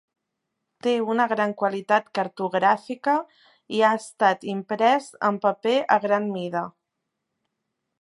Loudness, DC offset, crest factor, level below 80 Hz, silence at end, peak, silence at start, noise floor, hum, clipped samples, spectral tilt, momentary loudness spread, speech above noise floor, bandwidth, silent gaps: -23 LUFS; under 0.1%; 20 dB; -78 dBFS; 1.3 s; -4 dBFS; 0.85 s; -81 dBFS; none; under 0.1%; -5 dB/octave; 8 LU; 58 dB; 11.5 kHz; none